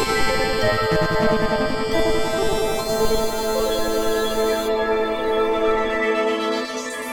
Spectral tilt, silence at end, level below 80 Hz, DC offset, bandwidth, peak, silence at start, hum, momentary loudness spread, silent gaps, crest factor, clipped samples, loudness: -4 dB/octave; 0 s; -34 dBFS; under 0.1%; 19.5 kHz; -6 dBFS; 0 s; none; 3 LU; none; 14 dB; under 0.1%; -21 LUFS